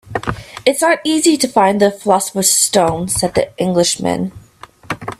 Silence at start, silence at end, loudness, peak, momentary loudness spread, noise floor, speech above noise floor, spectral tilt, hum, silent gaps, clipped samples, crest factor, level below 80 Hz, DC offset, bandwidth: 0.05 s; 0.05 s; -14 LUFS; 0 dBFS; 11 LU; -41 dBFS; 27 dB; -3.5 dB/octave; none; none; under 0.1%; 16 dB; -44 dBFS; under 0.1%; 16 kHz